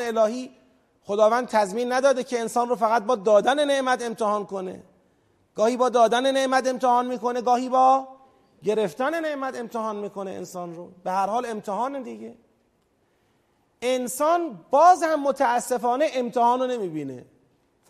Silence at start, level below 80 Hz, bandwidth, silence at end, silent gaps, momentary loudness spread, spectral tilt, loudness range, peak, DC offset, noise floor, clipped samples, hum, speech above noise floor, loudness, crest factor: 0 s; -72 dBFS; 15 kHz; 0.65 s; none; 15 LU; -4 dB/octave; 8 LU; -6 dBFS; under 0.1%; -67 dBFS; under 0.1%; none; 44 dB; -23 LUFS; 18 dB